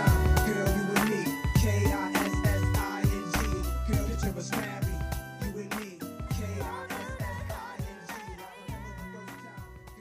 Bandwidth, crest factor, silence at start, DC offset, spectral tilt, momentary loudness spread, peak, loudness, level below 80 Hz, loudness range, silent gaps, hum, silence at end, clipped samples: 15.5 kHz; 18 dB; 0 s; under 0.1%; -5.5 dB/octave; 15 LU; -12 dBFS; -30 LUFS; -36 dBFS; 10 LU; none; none; 0 s; under 0.1%